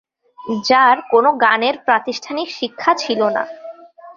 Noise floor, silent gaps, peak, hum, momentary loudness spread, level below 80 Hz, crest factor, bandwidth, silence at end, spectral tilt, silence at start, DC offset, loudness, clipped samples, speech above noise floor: -37 dBFS; none; 0 dBFS; none; 14 LU; -64 dBFS; 18 dB; 7.4 kHz; 0.05 s; -3.5 dB/octave; 0.4 s; under 0.1%; -16 LUFS; under 0.1%; 21 dB